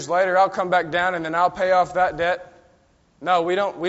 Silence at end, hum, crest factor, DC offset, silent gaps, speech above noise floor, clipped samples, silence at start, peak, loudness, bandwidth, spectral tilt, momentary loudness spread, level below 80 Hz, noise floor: 0 s; none; 16 dB; under 0.1%; none; 38 dB; under 0.1%; 0 s; -6 dBFS; -21 LUFS; 8 kHz; -2.5 dB/octave; 5 LU; -56 dBFS; -59 dBFS